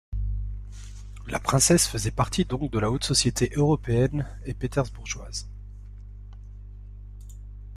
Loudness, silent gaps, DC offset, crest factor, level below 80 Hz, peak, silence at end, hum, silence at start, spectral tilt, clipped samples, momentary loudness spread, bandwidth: -25 LUFS; none; under 0.1%; 20 dB; -38 dBFS; -8 dBFS; 0 s; 50 Hz at -35 dBFS; 0.1 s; -4.5 dB/octave; under 0.1%; 24 LU; 15.5 kHz